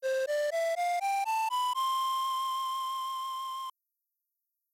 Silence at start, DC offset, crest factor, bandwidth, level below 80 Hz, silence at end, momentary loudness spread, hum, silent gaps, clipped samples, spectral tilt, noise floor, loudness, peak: 0 s; under 0.1%; 8 dB; 16 kHz; under -90 dBFS; 1.05 s; 7 LU; none; none; under 0.1%; 3 dB/octave; -84 dBFS; -31 LUFS; -24 dBFS